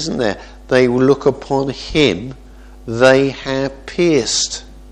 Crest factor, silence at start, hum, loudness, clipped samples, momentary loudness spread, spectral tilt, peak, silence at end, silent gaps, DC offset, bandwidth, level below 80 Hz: 16 dB; 0 s; none; -15 LUFS; under 0.1%; 14 LU; -4.5 dB/octave; 0 dBFS; 0 s; none; under 0.1%; 10 kHz; -38 dBFS